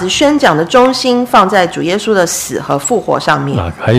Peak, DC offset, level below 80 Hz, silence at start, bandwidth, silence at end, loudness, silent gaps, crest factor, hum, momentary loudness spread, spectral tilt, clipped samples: 0 dBFS; under 0.1%; -40 dBFS; 0 s; 16 kHz; 0 s; -11 LUFS; none; 10 dB; none; 7 LU; -4 dB/octave; 0.6%